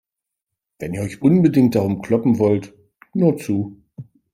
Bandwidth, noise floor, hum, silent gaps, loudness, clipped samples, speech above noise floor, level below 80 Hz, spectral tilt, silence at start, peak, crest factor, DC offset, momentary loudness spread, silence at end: 15.5 kHz; -83 dBFS; none; none; -18 LUFS; under 0.1%; 66 dB; -56 dBFS; -8.5 dB/octave; 0.8 s; -4 dBFS; 16 dB; under 0.1%; 14 LU; 0.3 s